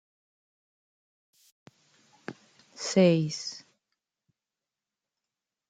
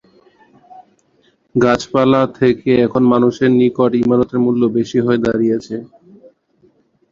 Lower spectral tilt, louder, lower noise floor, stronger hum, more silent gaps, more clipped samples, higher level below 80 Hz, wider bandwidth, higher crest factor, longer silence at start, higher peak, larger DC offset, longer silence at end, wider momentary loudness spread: second, -5.5 dB/octave vs -7 dB/octave; second, -26 LUFS vs -14 LUFS; first, -90 dBFS vs -57 dBFS; neither; neither; neither; second, -80 dBFS vs -50 dBFS; first, 9.4 kHz vs 7.4 kHz; first, 22 dB vs 14 dB; first, 2.3 s vs 0.8 s; second, -10 dBFS vs 0 dBFS; neither; first, 2.1 s vs 1.25 s; first, 23 LU vs 4 LU